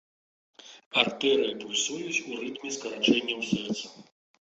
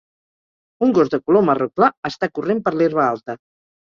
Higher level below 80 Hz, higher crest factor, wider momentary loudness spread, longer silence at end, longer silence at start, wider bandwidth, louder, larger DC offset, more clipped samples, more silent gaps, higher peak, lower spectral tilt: second, -70 dBFS vs -60 dBFS; first, 26 dB vs 18 dB; about the same, 11 LU vs 9 LU; about the same, 0.5 s vs 0.5 s; second, 0.65 s vs 0.8 s; first, 8.2 kHz vs 7.2 kHz; second, -28 LUFS vs -18 LUFS; neither; neither; about the same, 0.86-0.91 s vs 1.97-2.03 s; about the same, -4 dBFS vs -2 dBFS; second, -2.5 dB/octave vs -7.5 dB/octave